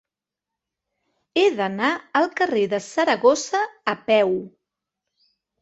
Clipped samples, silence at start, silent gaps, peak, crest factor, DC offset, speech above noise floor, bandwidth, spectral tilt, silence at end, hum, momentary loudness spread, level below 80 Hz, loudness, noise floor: under 0.1%; 1.35 s; none; -4 dBFS; 20 dB; under 0.1%; 66 dB; 8.2 kHz; -3.5 dB/octave; 1.15 s; none; 7 LU; -68 dBFS; -21 LUFS; -87 dBFS